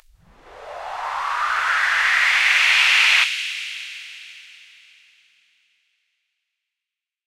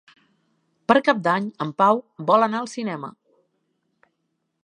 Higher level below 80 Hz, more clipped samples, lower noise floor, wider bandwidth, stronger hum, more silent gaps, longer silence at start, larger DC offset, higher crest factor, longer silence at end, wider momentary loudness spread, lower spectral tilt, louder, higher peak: first, -60 dBFS vs -72 dBFS; neither; first, -87 dBFS vs -75 dBFS; first, 16 kHz vs 10.5 kHz; neither; neither; second, 0.45 s vs 0.9 s; neither; about the same, 20 dB vs 24 dB; first, 2.85 s vs 1.55 s; first, 22 LU vs 13 LU; second, 3.5 dB/octave vs -5.5 dB/octave; first, -16 LUFS vs -21 LUFS; second, -4 dBFS vs 0 dBFS